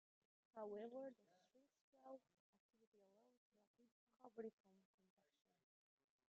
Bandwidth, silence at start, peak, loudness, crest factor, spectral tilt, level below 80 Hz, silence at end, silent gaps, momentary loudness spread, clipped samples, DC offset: 6.6 kHz; 0.55 s; -42 dBFS; -58 LUFS; 20 dB; -5.5 dB/octave; under -90 dBFS; 1.55 s; 1.81-1.93 s, 2.40-2.53 s, 2.60-2.69 s, 2.87-2.92 s, 3.37-3.52 s, 3.67-3.74 s, 3.92-4.07 s, 4.53-4.64 s; 10 LU; under 0.1%; under 0.1%